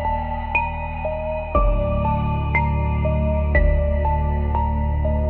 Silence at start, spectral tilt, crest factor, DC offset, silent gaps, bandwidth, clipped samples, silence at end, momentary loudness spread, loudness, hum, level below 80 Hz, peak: 0 s; -7.5 dB/octave; 14 dB; under 0.1%; none; 4 kHz; under 0.1%; 0 s; 6 LU; -22 LUFS; none; -24 dBFS; -6 dBFS